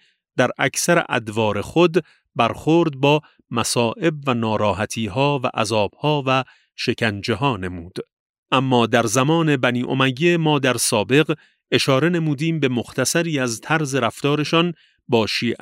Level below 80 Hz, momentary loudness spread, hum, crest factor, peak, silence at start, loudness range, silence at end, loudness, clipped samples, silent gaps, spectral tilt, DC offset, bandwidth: -56 dBFS; 7 LU; none; 18 dB; -2 dBFS; 0.35 s; 3 LU; 0.05 s; -20 LUFS; under 0.1%; 8.13-8.43 s; -4.5 dB/octave; under 0.1%; 16 kHz